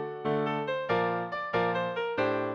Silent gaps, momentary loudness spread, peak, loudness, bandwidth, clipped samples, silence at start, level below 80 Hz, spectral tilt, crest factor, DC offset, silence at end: none; 3 LU; -16 dBFS; -30 LUFS; 7 kHz; under 0.1%; 0 s; -64 dBFS; -7.5 dB/octave; 14 dB; under 0.1%; 0 s